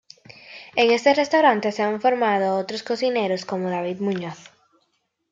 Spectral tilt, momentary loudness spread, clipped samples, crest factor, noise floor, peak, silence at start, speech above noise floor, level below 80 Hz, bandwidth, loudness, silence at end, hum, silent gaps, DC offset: -5 dB/octave; 11 LU; under 0.1%; 20 dB; -71 dBFS; -4 dBFS; 0.45 s; 50 dB; -72 dBFS; 7.8 kHz; -21 LUFS; 0.9 s; none; none; under 0.1%